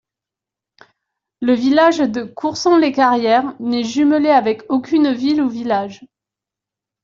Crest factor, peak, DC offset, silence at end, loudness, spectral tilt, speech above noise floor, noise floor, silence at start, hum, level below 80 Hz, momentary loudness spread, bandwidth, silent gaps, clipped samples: 14 dB; -2 dBFS; under 0.1%; 1 s; -16 LUFS; -4.5 dB/octave; 71 dB; -86 dBFS; 1.4 s; none; -60 dBFS; 8 LU; 7.6 kHz; none; under 0.1%